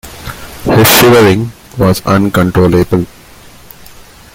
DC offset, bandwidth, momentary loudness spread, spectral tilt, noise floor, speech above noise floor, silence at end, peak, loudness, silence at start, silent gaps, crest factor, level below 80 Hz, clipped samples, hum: under 0.1%; over 20 kHz; 19 LU; -5 dB/octave; -36 dBFS; 28 dB; 1.3 s; 0 dBFS; -8 LUFS; 0.05 s; none; 10 dB; -34 dBFS; 0.2%; none